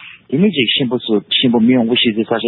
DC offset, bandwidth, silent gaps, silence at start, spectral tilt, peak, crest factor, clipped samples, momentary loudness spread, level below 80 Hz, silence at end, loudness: under 0.1%; 4.2 kHz; none; 0 s; -11 dB/octave; -2 dBFS; 12 dB; under 0.1%; 5 LU; -56 dBFS; 0 s; -14 LUFS